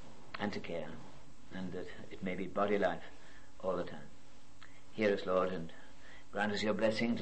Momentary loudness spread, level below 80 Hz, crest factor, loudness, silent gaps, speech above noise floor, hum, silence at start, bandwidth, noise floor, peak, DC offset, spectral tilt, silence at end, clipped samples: 23 LU; -66 dBFS; 20 dB; -37 LUFS; none; 24 dB; none; 0 s; 8.4 kHz; -60 dBFS; -20 dBFS; 0.8%; -6 dB/octave; 0 s; under 0.1%